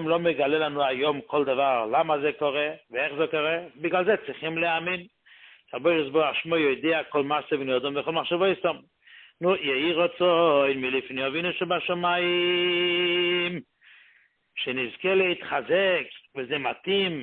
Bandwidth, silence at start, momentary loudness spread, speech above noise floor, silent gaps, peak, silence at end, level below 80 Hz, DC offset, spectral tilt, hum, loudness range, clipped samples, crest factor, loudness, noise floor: 4.4 kHz; 0 s; 7 LU; 37 dB; none; -10 dBFS; 0 s; -68 dBFS; under 0.1%; -9 dB/octave; none; 3 LU; under 0.1%; 16 dB; -25 LUFS; -62 dBFS